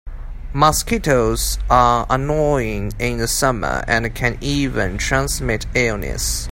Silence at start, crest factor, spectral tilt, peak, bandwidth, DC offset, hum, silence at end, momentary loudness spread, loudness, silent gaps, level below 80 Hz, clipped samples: 0.05 s; 18 dB; -4 dB/octave; 0 dBFS; 16.5 kHz; under 0.1%; none; 0 s; 7 LU; -18 LUFS; none; -28 dBFS; under 0.1%